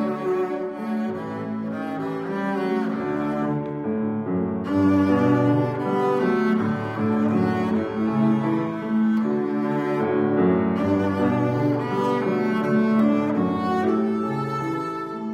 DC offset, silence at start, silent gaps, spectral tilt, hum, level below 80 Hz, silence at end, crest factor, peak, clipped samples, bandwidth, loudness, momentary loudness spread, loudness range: under 0.1%; 0 s; none; -8.5 dB/octave; none; -62 dBFS; 0 s; 14 dB; -8 dBFS; under 0.1%; 8.4 kHz; -23 LUFS; 8 LU; 5 LU